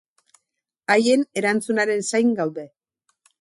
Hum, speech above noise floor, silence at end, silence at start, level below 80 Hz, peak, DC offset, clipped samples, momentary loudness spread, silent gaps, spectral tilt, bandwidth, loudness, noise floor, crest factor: none; 60 dB; 0.75 s; 0.9 s; -72 dBFS; -4 dBFS; under 0.1%; under 0.1%; 11 LU; none; -4 dB/octave; 11.5 kHz; -21 LUFS; -80 dBFS; 18 dB